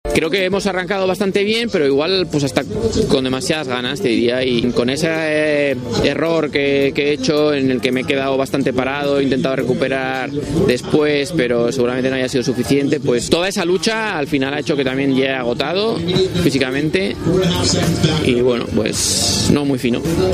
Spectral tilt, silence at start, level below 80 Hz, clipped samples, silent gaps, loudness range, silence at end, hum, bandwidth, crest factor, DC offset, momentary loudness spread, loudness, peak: -4.5 dB/octave; 0.05 s; -40 dBFS; under 0.1%; none; 1 LU; 0 s; none; 15.5 kHz; 16 dB; under 0.1%; 3 LU; -17 LUFS; 0 dBFS